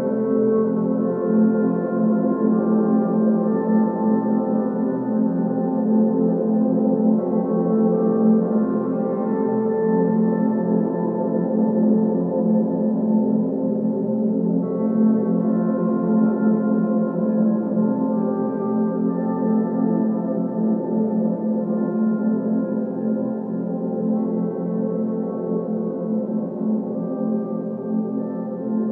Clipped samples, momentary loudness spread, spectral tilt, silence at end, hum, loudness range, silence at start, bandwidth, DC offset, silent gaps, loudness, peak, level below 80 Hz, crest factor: under 0.1%; 6 LU; -14 dB/octave; 0 s; none; 5 LU; 0 s; 2.1 kHz; under 0.1%; none; -21 LUFS; -6 dBFS; -70 dBFS; 14 dB